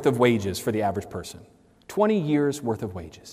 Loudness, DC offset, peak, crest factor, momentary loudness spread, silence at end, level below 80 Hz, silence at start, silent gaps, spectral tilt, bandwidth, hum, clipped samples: -25 LUFS; under 0.1%; -6 dBFS; 18 dB; 15 LU; 0 s; -60 dBFS; 0 s; none; -6 dB/octave; 16 kHz; none; under 0.1%